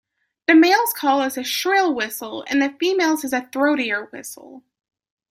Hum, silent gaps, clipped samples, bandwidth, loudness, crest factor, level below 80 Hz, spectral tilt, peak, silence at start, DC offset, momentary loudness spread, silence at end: none; none; under 0.1%; 16.5 kHz; -19 LUFS; 18 dB; -70 dBFS; -2 dB/octave; -2 dBFS; 0.5 s; under 0.1%; 14 LU; 0.7 s